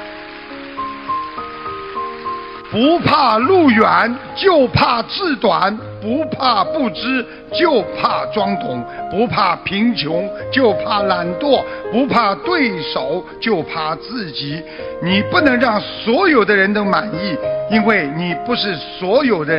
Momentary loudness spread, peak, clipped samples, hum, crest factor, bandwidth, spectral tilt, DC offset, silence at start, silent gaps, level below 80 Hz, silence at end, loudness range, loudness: 13 LU; 0 dBFS; under 0.1%; none; 16 dB; 5.8 kHz; -8 dB/octave; under 0.1%; 0 s; none; -46 dBFS; 0 s; 4 LU; -16 LUFS